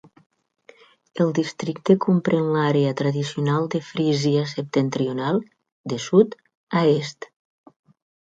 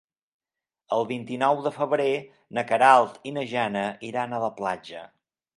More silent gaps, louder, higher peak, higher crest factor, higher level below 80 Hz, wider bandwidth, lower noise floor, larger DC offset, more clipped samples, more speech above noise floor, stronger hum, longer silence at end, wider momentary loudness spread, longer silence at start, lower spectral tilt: first, 5.72-5.84 s, 6.57-6.67 s vs none; first, -22 LUFS vs -25 LUFS; about the same, -2 dBFS vs -4 dBFS; about the same, 20 dB vs 22 dB; first, -66 dBFS vs -74 dBFS; second, 9 kHz vs 11.5 kHz; second, -52 dBFS vs -82 dBFS; neither; neither; second, 31 dB vs 57 dB; neither; first, 1 s vs 0.5 s; second, 11 LU vs 14 LU; first, 1.15 s vs 0.9 s; first, -6.5 dB/octave vs -5 dB/octave